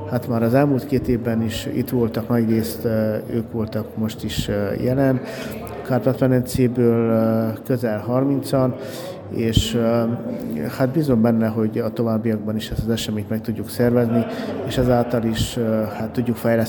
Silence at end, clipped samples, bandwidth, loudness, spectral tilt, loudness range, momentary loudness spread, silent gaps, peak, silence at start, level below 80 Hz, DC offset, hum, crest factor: 0 s; under 0.1%; over 20 kHz; -21 LUFS; -7 dB/octave; 2 LU; 8 LU; none; 0 dBFS; 0 s; -40 dBFS; under 0.1%; none; 20 dB